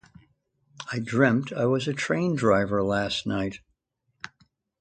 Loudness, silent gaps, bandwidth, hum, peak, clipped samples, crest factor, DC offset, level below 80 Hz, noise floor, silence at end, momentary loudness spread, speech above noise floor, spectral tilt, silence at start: -25 LUFS; none; 9.4 kHz; none; -6 dBFS; under 0.1%; 20 dB; under 0.1%; -56 dBFS; -75 dBFS; 0.55 s; 21 LU; 51 dB; -6 dB/octave; 0.8 s